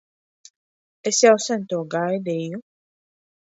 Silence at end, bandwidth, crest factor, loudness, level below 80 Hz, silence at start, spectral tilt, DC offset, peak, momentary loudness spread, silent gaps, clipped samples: 0.9 s; 8 kHz; 22 dB; -21 LUFS; -76 dBFS; 1.05 s; -3.5 dB/octave; under 0.1%; -2 dBFS; 15 LU; none; under 0.1%